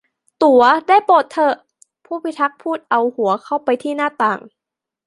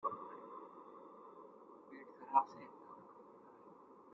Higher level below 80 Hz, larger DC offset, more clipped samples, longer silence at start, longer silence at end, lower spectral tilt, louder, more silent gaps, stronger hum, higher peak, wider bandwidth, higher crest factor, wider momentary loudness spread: first, -66 dBFS vs under -90 dBFS; neither; neither; first, 0.4 s vs 0 s; first, 0.6 s vs 0 s; about the same, -5 dB/octave vs -4.5 dB/octave; first, -16 LUFS vs -41 LUFS; neither; neither; first, -2 dBFS vs -18 dBFS; first, 11.5 kHz vs 6 kHz; second, 16 dB vs 28 dB; second, 14 LU vs 25 LU